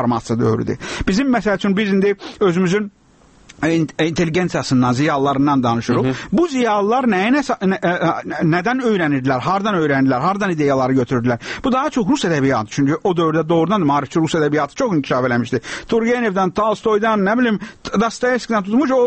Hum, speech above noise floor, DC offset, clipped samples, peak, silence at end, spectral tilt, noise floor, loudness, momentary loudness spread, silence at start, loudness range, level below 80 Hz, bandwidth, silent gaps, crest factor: none; 33 dB; under 0.1%; under 0.1%; -4 dBFS; 0 s; -6 dB/octave; -49 dBFS; -17 LUFS; 4 LU; 0 s; 2 LU; -44 dBFS; 8.8 kHz; none; 12 dB